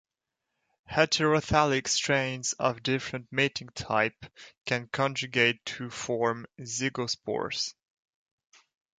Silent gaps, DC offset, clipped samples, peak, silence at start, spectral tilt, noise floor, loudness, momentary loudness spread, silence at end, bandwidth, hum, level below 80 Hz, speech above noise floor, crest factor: none; under 0.1%; under 0.1%; -8 dBFS; 0.9 s; -3.5 dB/octave; -86 dBFS; -28 LUFS; 11 LU; 1.25 s; 9.6 kHz; none; -56 dBFS; 57 dB; 24 dB